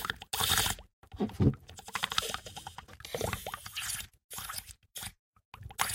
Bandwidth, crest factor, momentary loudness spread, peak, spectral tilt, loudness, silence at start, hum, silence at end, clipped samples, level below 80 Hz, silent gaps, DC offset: 17 kHz; 28 dB; 17 LU; -8 dBFS; -3 dB/octave; -34 LUFS; 0 s; none; 0 s; under 0.1%; -52 dBFS; 0.93-1.02 s, 4.24-4.29 s, 5.19-5.33 s, 5.45-5.52 s; under 0.1%